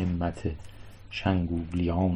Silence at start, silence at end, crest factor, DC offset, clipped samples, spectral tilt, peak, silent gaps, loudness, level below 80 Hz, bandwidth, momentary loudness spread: 0 s; 0 s; 16 dB; under 0.1%; under 0.1%; -8 dB/octave; -12 dBFS; none; -30 LUFS; -38 dBFS; 9.4 kHz; 18 LU